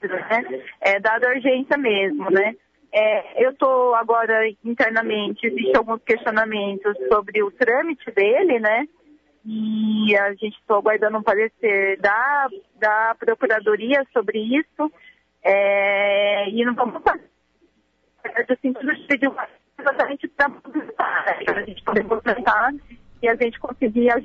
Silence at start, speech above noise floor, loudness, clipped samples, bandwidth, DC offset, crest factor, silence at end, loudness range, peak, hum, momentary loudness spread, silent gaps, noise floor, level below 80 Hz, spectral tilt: 0 s; 45 dB; -20 LUFS; under 0.1%; 7.2 kHz; under 0.1%; 16 dB; 0 s; 4 LU; -6 dBFS; none; 7 LU; none; -65 dBFS; -58 dBFS; -6.5 dB/octave